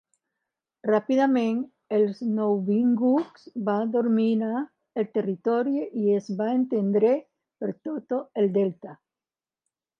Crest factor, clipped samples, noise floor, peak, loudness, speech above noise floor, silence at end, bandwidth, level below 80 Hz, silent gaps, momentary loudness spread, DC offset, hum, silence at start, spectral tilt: 16 dB; under 0.1%; under -90 dBFS; -10 dBFS; -25 LUFS; over 66 dB; 1.05 s; 6.6 kHz; -80 dBFS; none; 11 LU; under 0.1%; none; 0.85 s; -8.5 dB/octave